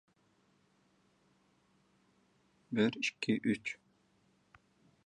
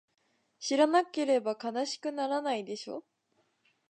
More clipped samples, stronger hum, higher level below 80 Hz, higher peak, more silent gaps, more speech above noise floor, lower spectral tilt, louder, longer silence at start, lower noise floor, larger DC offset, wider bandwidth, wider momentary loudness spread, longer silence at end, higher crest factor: neither; neither; first, -78 dBFS vs -88 dBFS; second, -18 dBFS vs -14 dBFS; neither; second, 39 dB vs 45 dB; first, -5 dB/octave vs -3 dB/octave; second, -35 LUFS vs -31 LUFS; first, 2.7 s vs 0.6 s; about the same, -73 dBFS vs -75 dBFS; neither; about the same, 10 kHz vs 9.4 kHz; second, 10 LU vs 14 LU; first, 1.3 s vs 0.9 s; first, 24 dB vs 18 dB